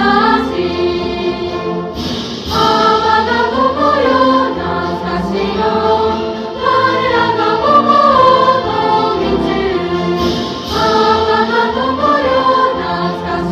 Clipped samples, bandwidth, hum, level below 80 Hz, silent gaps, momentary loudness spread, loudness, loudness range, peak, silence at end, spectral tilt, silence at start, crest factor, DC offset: under 0.1%; 14.5 kHz; none; -36 dBFS; none; 8 LU; -13 LUFS; 3 LU; 0 dBFS; 0 s; -5.5 dB/octave; 0 s; 12 dB; under 0.1%